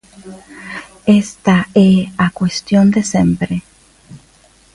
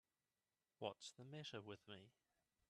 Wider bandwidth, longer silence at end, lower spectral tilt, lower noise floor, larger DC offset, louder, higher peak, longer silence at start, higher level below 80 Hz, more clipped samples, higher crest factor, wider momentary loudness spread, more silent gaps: about the same, 11.5 kHz vs 12.5 kHz; about the same, 0.6 s vs 0.6 s; first, -6 dB/octave vs -4 dB/octave; second, -49 dBFS vs under -90 dBFS; neither; first, -14 LUFS vs -55 LUFS; first, 0 dBFS vs -32 dBFS; second, 0.25 s vs 0.8 s; first, -44 dBFS vs under -90 dBFS; neither; second, 14 dB vs 26 dB; first, 18 LU vs 9 LU; neither